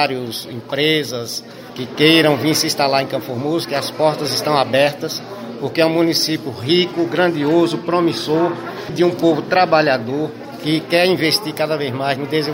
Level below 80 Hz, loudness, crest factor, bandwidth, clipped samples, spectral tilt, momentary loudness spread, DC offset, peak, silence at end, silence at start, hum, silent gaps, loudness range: -60 dBFS; -17 LUFS; 16 dB; 16.5 kHz; under 0.1%; -4.5 dB/octave; 12 LU; under 0.1%; 0 dBFS; 0 s; 0 s; none; none; 1 LU